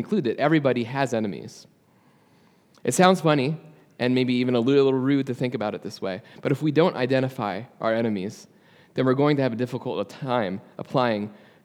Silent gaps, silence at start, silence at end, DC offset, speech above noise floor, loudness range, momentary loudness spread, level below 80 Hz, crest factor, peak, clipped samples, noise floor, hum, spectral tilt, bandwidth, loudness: none; 0 s; 0.3 s; under 0.1%; 36 dB; 4 LU; 12 LU; -76 dBFS; 22 dB; -2 dBFS; under 0.1%; -59 dBFS; none; -6 dB/octave; 15.5 kHz; -24 LUFS